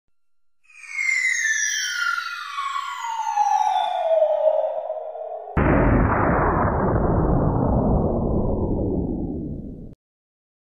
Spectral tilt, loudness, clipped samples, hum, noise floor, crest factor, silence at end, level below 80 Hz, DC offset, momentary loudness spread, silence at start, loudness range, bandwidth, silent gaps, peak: -5 dB/octave; -22 LUFS; under 0.1%; none; -74 dBFS; 16 dB; 0.8 s; -32 dBFS; 0.1%; 12 LU; 0.75 s; 3 LU; 15.5 kHz; none; -6 dBFS